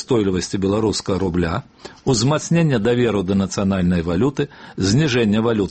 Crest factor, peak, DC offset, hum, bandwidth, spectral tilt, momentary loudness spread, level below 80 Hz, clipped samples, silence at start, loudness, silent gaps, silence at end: 12 dB; -6 dBFS; under 0.1%; none; 8.8 kHz; -6 dB/octave; 6 LU; -42 dBFS; under 0.1%; 0 s; -19 LUFS; none; 0 s